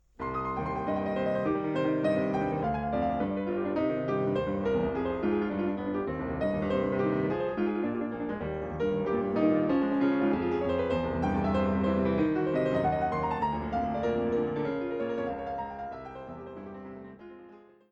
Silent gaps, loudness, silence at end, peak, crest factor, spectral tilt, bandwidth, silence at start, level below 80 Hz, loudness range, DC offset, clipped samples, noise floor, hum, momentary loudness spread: none; -30 LUFS; 0.3 s; -14 dBFS; 16 dB; -9 dB/octave; 7.4 kHz; 0.2 s; -50 dBFS; 4 LU; under 0.1%; under 0.1%; -53 dBFS; none; 9 LU